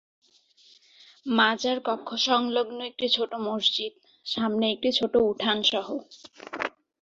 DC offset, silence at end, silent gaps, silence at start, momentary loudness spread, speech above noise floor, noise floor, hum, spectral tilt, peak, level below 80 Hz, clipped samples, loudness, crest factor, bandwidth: under 0.1%; 0.35 s; none; 1.25 s; 13 LU; 33 dB; -60 dBFS; none; -3.5 dB/octave; -6 dBFS; -68 dBFS; under 0.1%; -26 LUFS; 20 dB; 7.8 kHz